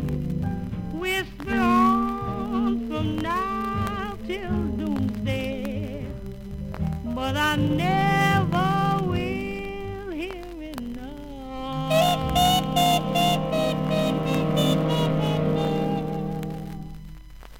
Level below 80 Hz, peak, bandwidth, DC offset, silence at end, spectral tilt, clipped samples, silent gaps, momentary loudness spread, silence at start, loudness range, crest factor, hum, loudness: -40 dBFS; -8 dBFS; 17 kHz; under 0.1%; 0 s; -5.5 dB/octave; under 0.1%; none; 14 LU; 0 s; 6 LU; 16 dB; none; -24 LUFS